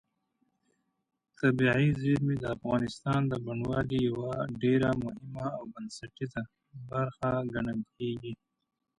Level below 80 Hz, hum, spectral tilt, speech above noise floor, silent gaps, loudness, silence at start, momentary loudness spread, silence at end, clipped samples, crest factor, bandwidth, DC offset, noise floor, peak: -56 dBFS; none; -7.5 dB/octave; 46 dB; none; -31 LUFS; 1.4 s; 14 LU; 0.65 s; under 0.1%; 20 dB; 11 kHz; under 0.1%; -77 dBFS; -12 dBFS